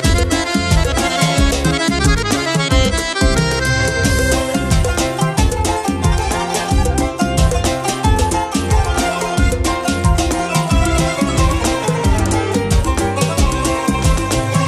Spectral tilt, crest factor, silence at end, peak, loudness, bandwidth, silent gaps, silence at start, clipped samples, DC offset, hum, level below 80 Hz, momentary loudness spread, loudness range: -4.5 dB/octave; 14 dB; 0 s; 0 dBFS; -16 LUFS; 14.5 kHz; none; 0 s; under 0.1%; under 0.1%; none; -20 dBFS; 3 LU; 2 LU